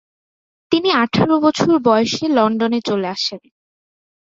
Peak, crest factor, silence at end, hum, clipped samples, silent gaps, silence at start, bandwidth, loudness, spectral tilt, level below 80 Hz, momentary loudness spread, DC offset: -2 dBFS; 16 dB; 0.85 s; none; under 0.1%; none; 0.7 s; 7.8 kHz; -16 LUFS; -5 dB/octave; -56 dBFS; 7 LU; under 0.1%